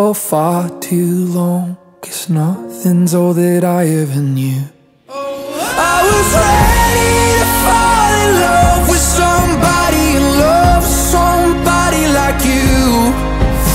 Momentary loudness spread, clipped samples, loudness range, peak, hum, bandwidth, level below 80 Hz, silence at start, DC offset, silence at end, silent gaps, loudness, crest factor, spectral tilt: 9 LU; under 0.1%; 5 LU; 0 dBFS; none; 16.5 kHz; -20 dBFS; 0 s; under 0.1%; 0 s; none; -12 LUFS; 12 dB; -4.5 dB/octave